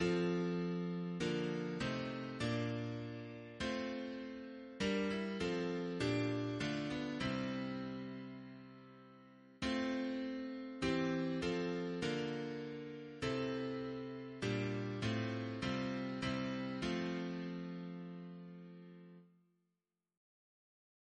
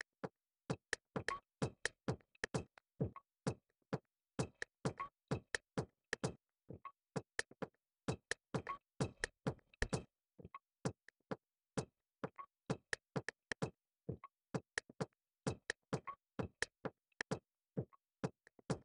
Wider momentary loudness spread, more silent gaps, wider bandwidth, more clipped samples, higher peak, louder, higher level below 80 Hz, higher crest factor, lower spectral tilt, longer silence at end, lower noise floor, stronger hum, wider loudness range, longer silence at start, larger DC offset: about the same, 13 LU vs 11 LU; neither; about the same, 10 kHz vs 11 kHz; neither; second, -24 dBFS vs -20 dBFS; first, -41 LUFS vs -47 LUFS; about the same, -66 dBFS vs -66 dBFS; second, 18 dB vs 26 dB; about the same, -6 dB/octave vs -5 dB/octave; first, 1.9 s vs 0 s; first, -89 dBFS vs -63 dBFS; neither; about the same, 5 LU vs 3 LU; second, 0 s vs 0.25 s; neither